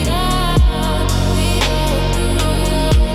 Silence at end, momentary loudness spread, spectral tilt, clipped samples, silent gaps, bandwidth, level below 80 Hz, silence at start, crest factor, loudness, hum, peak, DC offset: 0 s; 2 LU; -5 dB/octave; under 0.1%; none; 15.5 kHz; -18 dBFS; 0 s; 10 dB; -16 LUFS; none; -4 dBFS; under 0.1%